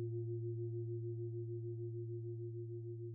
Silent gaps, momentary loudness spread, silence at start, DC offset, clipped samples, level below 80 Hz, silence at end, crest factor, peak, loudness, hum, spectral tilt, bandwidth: none; 4 LU; 0 s; under 0.1%; under 0.1%; -82 dBFS; 0 s; 8 dB; -36 dBFS; -45 LUFS; none; -6.5 dB/octave; 0.7 kHz